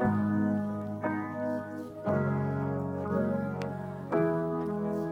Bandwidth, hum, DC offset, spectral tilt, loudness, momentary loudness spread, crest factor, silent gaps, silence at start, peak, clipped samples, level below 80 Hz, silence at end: 8 kHz; none; under 0.1%; -9.5 dB/octave; -32 LUFS; 8 LU; 16 dB; none; 0 s; -16 dBFS; under 0.1%; -62 dBFS; 0 s